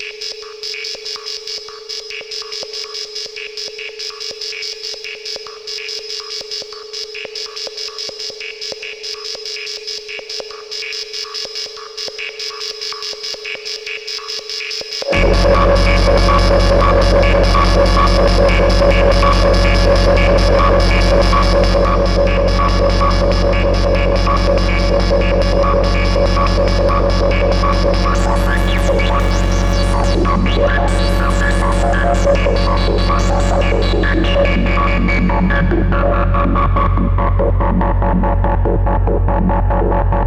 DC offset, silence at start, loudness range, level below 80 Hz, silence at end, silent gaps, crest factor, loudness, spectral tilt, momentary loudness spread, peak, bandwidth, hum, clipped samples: under 0.1%; 0 s; 12 LU; -18 dBFS; 0 s; none; 12 dB; -15 LUFS; -5.5 dB/octave; 12 LU; -2 dBFS; 11 kHz; none; under 0.1%